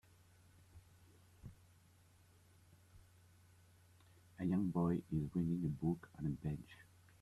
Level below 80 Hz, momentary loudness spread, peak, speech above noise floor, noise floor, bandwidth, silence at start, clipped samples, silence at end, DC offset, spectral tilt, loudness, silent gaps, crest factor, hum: -66 dBFS; 23 LU; -26 dBFS; 29 dB; -68 dBFS; 12.5 kHz; 0.75 s; under 0.1%; 0.4 s; under 0.1%; -9 dB/octave; -41 LUFS; none; 18 dB; none